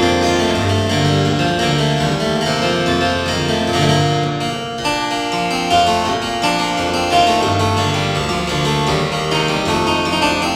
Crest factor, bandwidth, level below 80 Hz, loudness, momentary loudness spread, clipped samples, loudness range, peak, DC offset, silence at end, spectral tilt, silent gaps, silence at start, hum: 16 dB; 16 kHz; -40 dBFS; -16 LUFS; 4 LU; under 0.1%; 1 LU; 0 dBFS; under 0.1%; 0 s; -4.5 dB/octave; none; 0 s; none